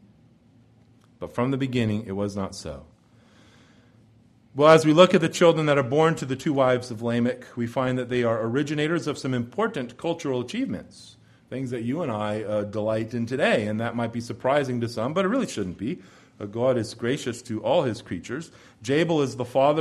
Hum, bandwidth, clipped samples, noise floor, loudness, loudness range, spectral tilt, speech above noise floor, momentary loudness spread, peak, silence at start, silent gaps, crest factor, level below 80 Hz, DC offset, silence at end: none; 13 kHz; under 0.1%; -57 dBFS; -24 LUFS; 10 LU; -6 dB/octave; 33 dB; 14 LU; -2 dBFS; 1.2 s; none; 22 dB; -60 dBFS; under 0.1%; 0 s